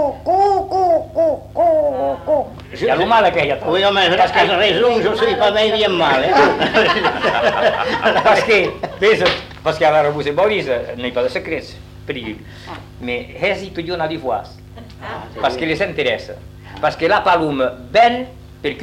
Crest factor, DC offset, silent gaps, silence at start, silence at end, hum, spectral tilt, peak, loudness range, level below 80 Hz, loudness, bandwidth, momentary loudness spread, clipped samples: 14 dB; under 0.1%; none; 0 s; 0 s; 50 Hz at -55 dBFS; -5 dB/octave; -2 dBFS; 9 LU; -42 dBFS; -16 LUFS; 15 kHz; 15 LU; under 0.1%